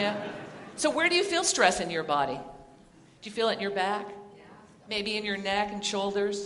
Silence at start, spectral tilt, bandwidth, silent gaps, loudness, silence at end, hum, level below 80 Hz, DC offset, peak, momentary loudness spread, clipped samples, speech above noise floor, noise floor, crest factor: 0 s; -2.5 dB/octave; 11.5 kHz; none; -28 LUFS; 0 s; none; -62 dBFS; under 0.1%; -6 dBFS; 18 LU; under 0.1%; 27 dB; -56 dBFS; 24 dB